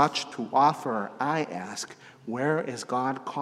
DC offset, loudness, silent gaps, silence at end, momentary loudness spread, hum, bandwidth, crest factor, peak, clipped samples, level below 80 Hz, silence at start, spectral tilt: under 0.1%; -28 LUFS; none; 0 s; 14 LU; none; 14 kHz; 20 dB; -8 dBFS; under 0.1%; -82 dBFS; 0 s; -4.5 dB/octave